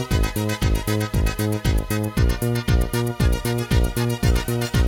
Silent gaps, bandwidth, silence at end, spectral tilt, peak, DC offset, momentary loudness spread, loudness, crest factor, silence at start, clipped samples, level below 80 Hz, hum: none; 18 kHz; 0 s; -5.5 dB/octave; -6 dBFS; under 0.1%; 2 LU; -22 LUFS; 14 dB; 0 s; under 0.1%; -24 dBFS; none